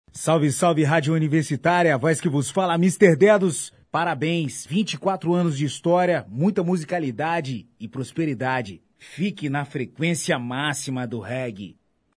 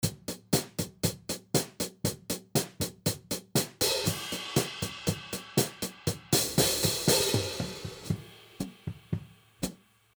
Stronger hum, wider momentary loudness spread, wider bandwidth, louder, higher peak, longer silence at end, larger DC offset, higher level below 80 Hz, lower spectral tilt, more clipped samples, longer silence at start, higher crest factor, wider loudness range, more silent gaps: neither; about the same, 11 LU vs 13 LU; second, 11 kHz vs over 20 kHz; first, -22 LUFS vs -30 LUFS; first, -2 dBFS vs -10 dBFS; about the same, 0.45 s vs 0.45 s; neither; second, -66 dBFS vs -54 dBFS; first, -5.5 dB/octave vs -3.5 dB/octave; neither; first, 0.15 s vs 0 s; about the same, 20 dB vs 22 dB; first, 7 LU vs 4 LU; neither